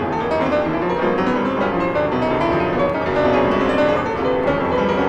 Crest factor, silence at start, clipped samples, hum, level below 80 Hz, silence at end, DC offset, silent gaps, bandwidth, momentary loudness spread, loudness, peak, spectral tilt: 12 dB; 0 s; under 0.1%; none; -40 dBFS; 0 s; under 0.1%; none; 8.8 kHz; 3 LU; -18 LUFS; -6 dBFS; -7 dB/octave